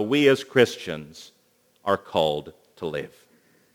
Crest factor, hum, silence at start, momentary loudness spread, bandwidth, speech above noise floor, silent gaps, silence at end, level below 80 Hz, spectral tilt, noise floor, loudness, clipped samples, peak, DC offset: 22 dB; none; 0 s; 19 LU; 20 kHz; 40 dB; none; 0.65 s; -62 dBFS; -5 dB/octave; -63 dBFS; -24 LUFS; under 0.1%; -4 dBFS; under 0.1%